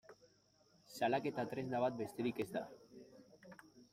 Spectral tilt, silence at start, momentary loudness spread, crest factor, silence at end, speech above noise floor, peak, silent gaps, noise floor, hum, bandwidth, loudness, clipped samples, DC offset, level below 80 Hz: -6 dB/octave; 0.1 s; 22 LU; 20 dB; 0.1 s; 33 dB; -24 dBFS; none; -72 dBFS; none; 16 kHz; -41 LUFS; under 0.1%; under 0.1%; -80 dBFS